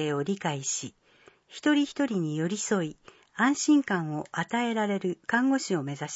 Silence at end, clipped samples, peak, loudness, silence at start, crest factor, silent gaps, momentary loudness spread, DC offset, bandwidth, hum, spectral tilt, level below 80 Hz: 0 s; under 0.1%; -12 dBFS; -28 LUFS; 0 s; 16 dB; none; 9 LU; under 0.1%; 8 kHz; none; -4.5 dB/octave; -74 dBFS